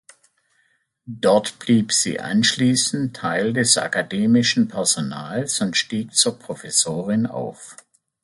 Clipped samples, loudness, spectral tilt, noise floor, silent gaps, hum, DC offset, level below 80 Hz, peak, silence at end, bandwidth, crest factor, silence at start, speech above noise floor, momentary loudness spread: under 0.1%; -19 LUFS; -3 dB/octave; -66 dBFS; none; none; under 0.1%; -62 dBFS; -2 dBFS; 0.5 s; 11.5 kHz; 20 dB; 1.05 s; 45 dB; 10 LU